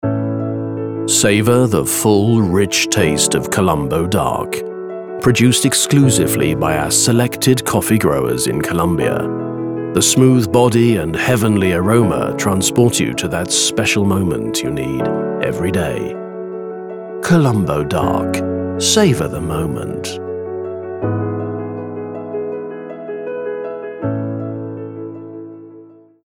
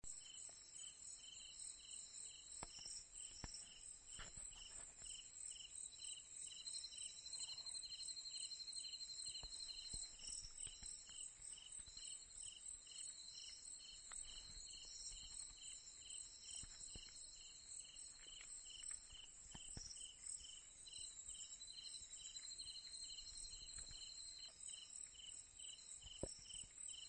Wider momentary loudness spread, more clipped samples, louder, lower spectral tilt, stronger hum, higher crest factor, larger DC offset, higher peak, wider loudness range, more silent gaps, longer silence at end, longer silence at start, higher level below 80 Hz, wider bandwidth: first, 14 LU vs 6 LU; neither; first, -16 LUFS vs -53 LUFS; first, -4.5 dB/octave vs 0 dB/octave; neither; second, 16 dB vs 24 dB; neither; first, 0 dBFS vs -30 dBFS; first, 10 LU vs 4 LU; neither; first, 0.4 s vs 0 s; about the same, 0.05 s vs 0.05 s; first, -42 dBFS vs -70 dBFS; first, over 20 kHz vs 12 kHz